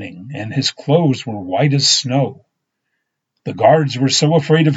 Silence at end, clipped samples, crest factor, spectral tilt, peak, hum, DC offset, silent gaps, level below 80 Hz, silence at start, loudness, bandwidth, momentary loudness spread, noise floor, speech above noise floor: 0 s; under 0.1%; 16 dB; -4.5 dB/octave; 0 dBFS; none; under 0.1%; none; -64 dBFS; 0 s; -15 LUFS; 8 kHz; 13 LU; -74 dBFS; 58 dB